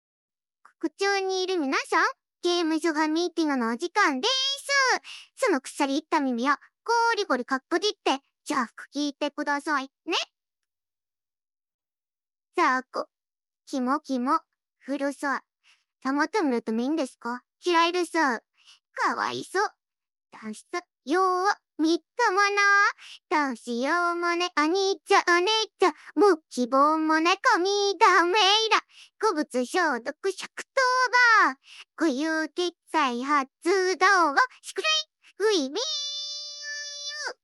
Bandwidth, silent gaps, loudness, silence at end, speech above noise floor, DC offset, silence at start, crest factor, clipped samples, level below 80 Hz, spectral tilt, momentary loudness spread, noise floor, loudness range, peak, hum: 13.5 kHz; 11.74-11.79 s; -25 LUFS; 0.1 s; over 65 dB; under 0.1%; 0.8 s; 20 dB; under 0.1%; under -90 dBFS; -1.5 dB/octave; 13 LU; under -90 dBFS; 8 LU; -6 dBFS; none